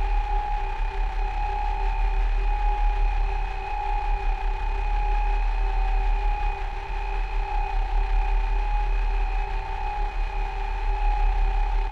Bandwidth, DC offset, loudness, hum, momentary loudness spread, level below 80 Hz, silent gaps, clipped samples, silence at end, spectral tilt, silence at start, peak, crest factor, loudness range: 5.2 kHz; under 0.1%; -29 LUFS; none; 4 LU; -24 dBFS; none; under 0.1%; 0 s; -6 dB/octave; 0 s; -14 dBFS; 10 dB; 1 LU